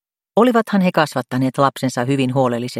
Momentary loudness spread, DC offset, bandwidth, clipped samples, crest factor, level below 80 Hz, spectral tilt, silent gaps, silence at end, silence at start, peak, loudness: 6 LU; under 0.1%; 15.5 kHz; under 0.1%; 18 dB; -60 dBFS; -6.5 dB/octave; none; 0 s; 0.35 s; 0 dBFS; -17 LUFS